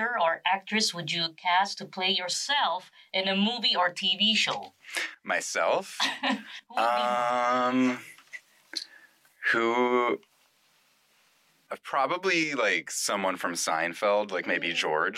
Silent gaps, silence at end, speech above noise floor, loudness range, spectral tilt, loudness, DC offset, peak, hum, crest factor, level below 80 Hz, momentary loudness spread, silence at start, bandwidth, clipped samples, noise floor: none; 0 s; 38 dB; 4 LU; -2.5 dB/octave; -27 LUFS; under 0.1%; -14 dBFS; none; 14 dB; -84 dBFS; 12 LU; 0 s; 16 kHz; under 0.1%; -66 dBFS